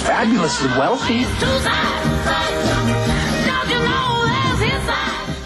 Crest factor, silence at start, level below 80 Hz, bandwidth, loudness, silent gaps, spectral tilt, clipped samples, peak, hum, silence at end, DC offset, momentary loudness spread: 10 dB; 0 s; -32 dBFS; 12.5 kHz; -18 LUFS; none; -4.5 dB/octave; under 0.1%; -8 dBFS; none; 0 s; under 0.1%; 2 LU